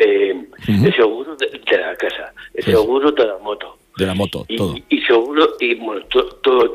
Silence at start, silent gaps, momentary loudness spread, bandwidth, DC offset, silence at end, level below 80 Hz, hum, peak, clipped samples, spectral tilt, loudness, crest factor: 0 s; none; 10 LU; 15 kHz; under 0.1%; 0 s; -48 dBFS; none; -2 dBFS; under 0.1%; -6.5 dB/octave; -17 LUFS; 16 dB